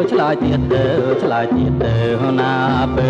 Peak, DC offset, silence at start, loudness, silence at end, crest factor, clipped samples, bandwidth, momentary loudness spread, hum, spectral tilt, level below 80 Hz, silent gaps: -4 dBFS; under 0.1%; 0 s; -16 LUFS; 0 s; 12 dB; under 0.1%; 7.8 kHz; 1 LU; none; -8.5 dB/octave; -32 dBFS; none